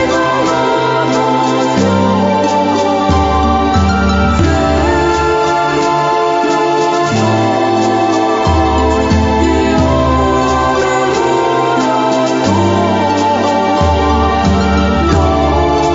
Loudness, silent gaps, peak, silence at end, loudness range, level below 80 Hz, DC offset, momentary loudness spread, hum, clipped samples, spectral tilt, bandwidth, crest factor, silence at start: -12 LUFS; none; 0 dBFS; 0 s; 0 LU; -24 dBFS; under 0.1%; 1 LU; none; under 0.1%; -6 dB/octave; 7.8 kHz; 12 dB; 0 s